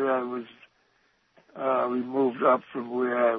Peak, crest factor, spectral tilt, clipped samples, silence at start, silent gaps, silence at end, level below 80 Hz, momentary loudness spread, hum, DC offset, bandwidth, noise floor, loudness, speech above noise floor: -8 dBFS; 18 dB; -8.5 dB/octave; under 0.1%; 0 s; none; 0 s; -80 dBFS; 11 LU; none; under 0.1%; 4.8 kHz; -68 dBFS; -27 LUFS; 42 dB